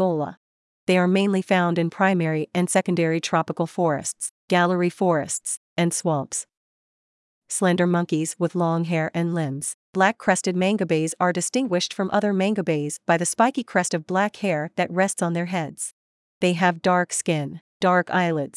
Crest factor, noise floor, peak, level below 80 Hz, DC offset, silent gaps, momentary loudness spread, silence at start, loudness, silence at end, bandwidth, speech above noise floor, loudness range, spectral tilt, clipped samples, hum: 18 dB; under -90 dBFS; -4 dBFS; -74 dBFS; under 0.1%; 0.37-0.87 s, 4.31-4.48 s, 5.57-5.76 s, 6.57-7.42 s, 9.74-9.93 s, 15.93-16.41 s, 17.61-17.80 s; 7 LU; 0 s; -23 LUFS; 0.1 s; 12 kHz; over 68 dB; 3 LU; -5 dB/octave; under 0.1%; none